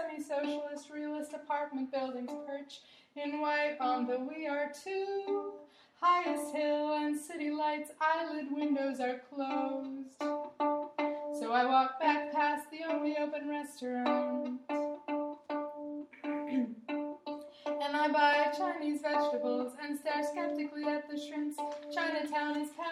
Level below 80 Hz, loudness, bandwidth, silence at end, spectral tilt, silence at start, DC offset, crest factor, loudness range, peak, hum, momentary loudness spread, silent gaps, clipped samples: -86 dBFS; -35 LUFS; 14 kHz; 0 s; -3 dB/octave; 0 s; under 0.1%; 18 dB; 5 LU; -16 dBFS; none; 11 LU; none; under 0.1%